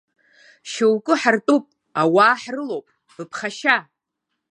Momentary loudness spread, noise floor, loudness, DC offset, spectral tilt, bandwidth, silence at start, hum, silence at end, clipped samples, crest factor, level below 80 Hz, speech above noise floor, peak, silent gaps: 16 LU; -79 dBFS; -19 LUFS; under 0.1%; -4.5 dB/octave; 11.5 kHz; 0.65 s; none; 0.7 s; under 0.1%; 20 dB; -76 dBFS; 60 dB; -2 dBFS; none